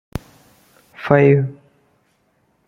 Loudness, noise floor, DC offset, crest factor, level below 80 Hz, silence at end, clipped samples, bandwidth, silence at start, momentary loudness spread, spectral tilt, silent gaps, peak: -15 LUFS; -63 dBFS; under 0.1%; 20 dB; -48 dBFS; 1.15 s; under 0.1%; 6.8 kHz; 0.15 s; 21 LU; -9 dB/octave; none; 0 dBFS